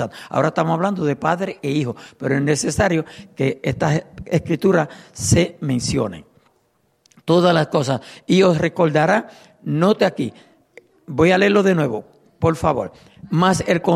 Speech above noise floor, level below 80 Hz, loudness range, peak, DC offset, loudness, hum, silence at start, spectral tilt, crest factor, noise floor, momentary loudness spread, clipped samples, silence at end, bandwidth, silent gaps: 45 dB; -46 dBFS; 3 LU; -2 dBFS; under 0.1%; -19 LUFS; none; 0 s; -5.5 dB/octave; 16 dB; -63 dBFS; 12 LU; under 0.1%; 0 s; 14.5 kHz; none